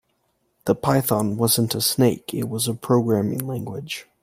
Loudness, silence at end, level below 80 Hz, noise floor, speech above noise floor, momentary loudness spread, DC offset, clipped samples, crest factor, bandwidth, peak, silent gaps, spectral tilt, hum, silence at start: -22 LUFS; 0.2 s; -56 dBFS; -69 dBFS; 48 dB; 11 LU; under 0.1%; under 0.1%; 18 dB; 16 kHz; -4 dBFS; none; -5 dB/octave; none; 0.65 s